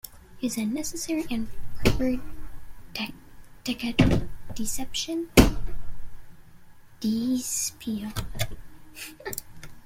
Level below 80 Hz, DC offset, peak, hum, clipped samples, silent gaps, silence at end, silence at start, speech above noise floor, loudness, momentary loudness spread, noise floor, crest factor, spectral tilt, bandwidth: -36 dBFS; under 0.1%; -2 dBFS; none; under 0.1%; none; 0.05 s; 0.05 s; 22 dB; -28 LUFS; 21 LU; -47 dBFS; 24 dB; -4.5 dB/octave; 16.5 kHz